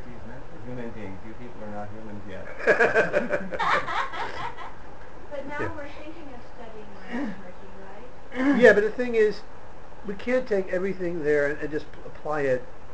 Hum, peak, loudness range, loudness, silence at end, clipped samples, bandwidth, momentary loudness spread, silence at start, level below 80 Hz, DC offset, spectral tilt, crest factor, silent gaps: none; -2 dBFS; 13 LU; -25 LUFS; 0 s; under 0.1%; 9 kHz; 23 LU; 0 s; -50 dBFS; 3%; -6 dB/octave; 24 dB; none